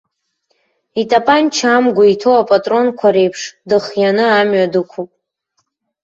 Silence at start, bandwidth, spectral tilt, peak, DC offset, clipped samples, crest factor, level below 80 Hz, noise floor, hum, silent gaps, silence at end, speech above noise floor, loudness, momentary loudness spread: 0.95 s; 7.8 kHz; -4.5 dB/octave; 0 dBFS; under 0.1%; under 0.1%; 14 dB; -60 dBFS; -67 dBFS; none; none; 1 s; 55 dB; -13 LUFS; 12 LU